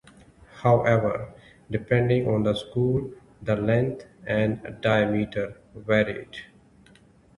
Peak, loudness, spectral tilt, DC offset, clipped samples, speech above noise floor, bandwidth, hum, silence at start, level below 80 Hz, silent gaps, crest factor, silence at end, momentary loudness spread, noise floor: -6 dBFS; -25 LUFS; -8 dB/octave; under 0.1%; under 0.1%; 32 dB; 11.5 kHz; none; 0.55 s; -52 dBFS; none; 20 dB; 0.95 s; 15 LU; -55 dBFS